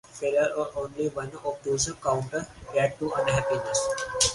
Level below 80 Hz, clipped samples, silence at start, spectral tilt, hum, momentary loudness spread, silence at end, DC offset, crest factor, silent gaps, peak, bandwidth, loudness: -52 dBFS; under 0.1%; 0.1 s; -3 dB/octave; none; 8 LU; 0 s; under 0.1%; 20 dB; none; -8 dBFS; 11.5 kHz; -28 LUFS